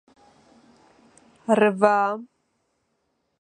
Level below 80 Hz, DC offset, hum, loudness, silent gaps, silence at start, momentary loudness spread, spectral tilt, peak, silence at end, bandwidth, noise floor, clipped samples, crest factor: -74 dBFS; under 0.1%; none; -21 LUFS; none; 1.5 s; 17 LU; -6 dB/octave; -2 dBFS; 1.2 s; 10 kHz; -73 dBFS; under 0.1%; 24 dB